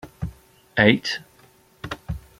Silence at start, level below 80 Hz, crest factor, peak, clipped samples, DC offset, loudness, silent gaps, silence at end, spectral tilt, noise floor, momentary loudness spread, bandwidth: 0.05 s; -44 dBFS; 24 dB; -2 dBFS; under 0.1%; under 0.1%; -21 LUFS; none; 0.2 s; -5.5 dB/octave; -55 dBFS; 18 LU; 16 kHz